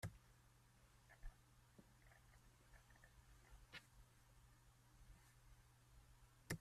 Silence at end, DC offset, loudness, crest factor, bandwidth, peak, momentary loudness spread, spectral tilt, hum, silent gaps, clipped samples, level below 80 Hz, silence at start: 0 s; under 0.1%; -63 LUFS; 32 dB; 14 kHz; -32 dBFS; 12 LU; -4.5 dB/octave; none; none; under 0.1%; -68 dBFS; 0 s